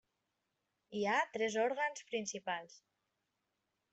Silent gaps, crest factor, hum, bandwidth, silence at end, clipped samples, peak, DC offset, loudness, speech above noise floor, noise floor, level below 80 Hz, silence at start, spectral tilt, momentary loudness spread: none; 20 dB; none; 8.2 kHz; 1.15 s; under 0.1%; -20 dBFS; under 0.1%; -37 LUFS; 48 dB; -86 dBFS; -86 dBFS; 0.9 s; -3 dB/octave; 8 LU